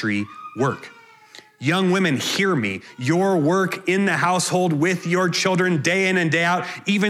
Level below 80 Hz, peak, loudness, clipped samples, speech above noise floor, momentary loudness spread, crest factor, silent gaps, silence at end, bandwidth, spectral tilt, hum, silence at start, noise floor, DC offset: -70 dBFS; -4 dBFS; -20 LUFS; under 0.1%; 27 dB; 6 LU; 16 dB; none; 0 s; 15 kHz; -4.5 dB/octave; none; 0 s; -47 dBFS; under 0.1%